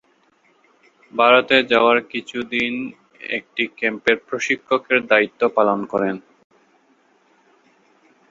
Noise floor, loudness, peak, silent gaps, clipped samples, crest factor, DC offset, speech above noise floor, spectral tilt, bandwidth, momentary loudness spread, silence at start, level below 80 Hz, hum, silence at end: -59 dBFS; -19 LUFS; -2 dBFS; none; under 0.1%; 20 dB; under 0.1%; 41 dB; -4 dB/octave; 7.8 kHz; 13 LU; 1.15 s; -64 dBFS; none; 2.1 s